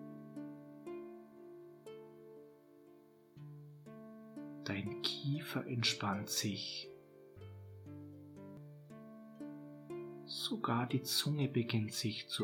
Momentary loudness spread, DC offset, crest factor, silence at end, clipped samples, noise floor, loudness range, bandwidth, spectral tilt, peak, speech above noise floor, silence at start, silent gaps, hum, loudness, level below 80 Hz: 21 LU; under 0.1%; 24 dB; 0 s; under 0.1%; -63 dBFS; 16 LU; 19 kHz; -4 dB/octave; -18 dBFS; 25 dB; 0 s; none; none; -39 LUFS; -84 dBFS